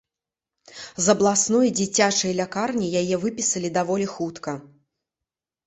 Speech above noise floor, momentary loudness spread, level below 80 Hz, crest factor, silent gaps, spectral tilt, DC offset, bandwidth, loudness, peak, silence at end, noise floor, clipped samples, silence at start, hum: 66 dB; 14 LU; -62 dBFS; 20 dB; none; -3.5 dB/octave; under 0.1%; 8.4 kHz; -22 LUFS; -4 dBFS; 1 s; -88 dBFS; under 0.1%; 0.7 s; none